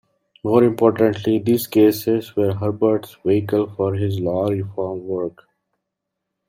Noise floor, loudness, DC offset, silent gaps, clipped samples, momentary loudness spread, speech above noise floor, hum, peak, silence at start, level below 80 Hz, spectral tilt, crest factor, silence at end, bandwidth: -80 dBFS; -19 LUFS; under 0.1%; none; under 0.1%; 10 LU; 61 dB; none; -2 dBFS; 0.45 s; -60 dBFS; -7.5 dB/octave; 18 dB; 1.2 s; 16 kHz